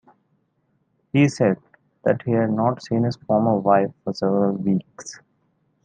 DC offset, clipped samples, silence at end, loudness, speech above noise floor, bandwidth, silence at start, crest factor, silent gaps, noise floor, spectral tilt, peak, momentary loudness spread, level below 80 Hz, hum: under 0.1%; under 0.1%; 0.7 s; -21 LUFS; 48 dB; 9.4 kHz; 1.15 s; 18 dB; none; -68 dBFS; -7.5 dB/octave; -4 dBFS; 8 LU; -64 dBFS; none